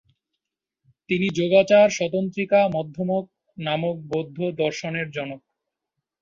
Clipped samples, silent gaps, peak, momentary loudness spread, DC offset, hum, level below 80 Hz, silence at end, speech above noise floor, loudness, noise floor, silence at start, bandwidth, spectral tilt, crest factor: under 0.1%; none; -4 dBFS; 14 LU; under 0.1%; none; -64 dBFS; 0.85 s; 62 dB; -22 LUFS; -83 dBFS; 1.1 s; 7.6 kHz; -5.5 dB/octave; 20 dB